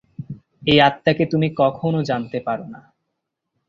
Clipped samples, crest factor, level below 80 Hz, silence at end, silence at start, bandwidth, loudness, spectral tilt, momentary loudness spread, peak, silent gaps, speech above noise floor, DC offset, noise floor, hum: under 0.1%; 20 dB; -54 dBFS; 0.9 s; 0.2 s; 7.4 kHz; -19 LUFS; -7 dB/octave; 21 LU; 0 dBFS; none; 59 dB; under 0.1%; -78 dBFS; none